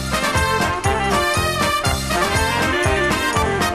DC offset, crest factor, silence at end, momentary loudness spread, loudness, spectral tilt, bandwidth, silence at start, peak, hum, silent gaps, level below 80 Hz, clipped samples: 0.3%; 14 dB; 0 s; 2 LU; -18 LUFS; -3.5 dB/octave; 14 kHz; 0 s; -4 dBFS; none; none; -30 dBFS; under 0.1%